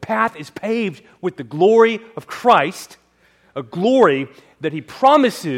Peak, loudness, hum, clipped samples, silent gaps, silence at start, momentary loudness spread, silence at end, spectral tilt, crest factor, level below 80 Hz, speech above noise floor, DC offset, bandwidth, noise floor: 0 dBFS; -17 LUFS; none; under 0.1%; none; 0 s; 17 LU; 0 s; -5.5 dB/octave; 16 dB; -62 dBFS; 39 dB; under 0.1%; 15.5 kHz; -56 dBFS